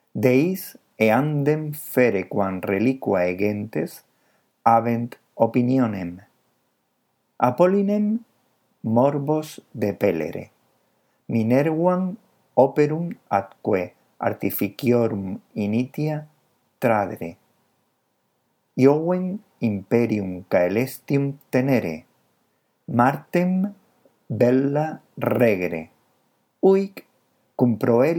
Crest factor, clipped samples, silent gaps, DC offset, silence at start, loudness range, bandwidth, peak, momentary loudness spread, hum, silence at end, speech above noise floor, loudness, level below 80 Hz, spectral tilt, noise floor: 22 dB; under 0.1%; none; under 0.1%; 0.15 s; 3 LU; 19 kHz; -2 dBFS; 12 LU; none; 0 s; 50 dB; -22 LUFS; -68 dBFS; -8 dB/octave; -71 dBFS